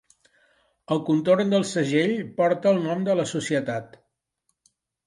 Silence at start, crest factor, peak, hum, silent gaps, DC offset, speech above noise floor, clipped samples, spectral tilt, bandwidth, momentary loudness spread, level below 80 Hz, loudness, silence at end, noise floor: 0.9 s; 18 dB; -8 dBFS; none; none; under 0.1%; 53 dB; under 0.1%; -5.5 dB/octave; 11.5 kHz; 7 LU; -70 dBFS; -23 LUFS; 1.2 s; -76 dBFS